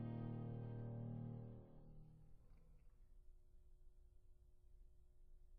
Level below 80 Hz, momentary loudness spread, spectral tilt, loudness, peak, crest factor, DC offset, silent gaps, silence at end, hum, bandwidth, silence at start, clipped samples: -64 dBFS; 16 LU; -10.5 dB/octave; -52 LUFS; -38 dBFS; 16 dB; under 0.1%; none; 0 s; none; 3.6 kHz; 0 s; under 0.1%